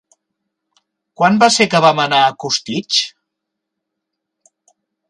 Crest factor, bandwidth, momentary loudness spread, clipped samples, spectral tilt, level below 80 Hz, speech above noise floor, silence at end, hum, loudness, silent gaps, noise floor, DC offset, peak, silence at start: 18 dB; 11.5 kHz; 8 LU; under 0.1%; -3 dB/octave; -64 dBFS; 65 dB; 2 s; none; -13 LUFS; none; -78 dBFS; under 0.1%; 0 dBFS; 1.2 s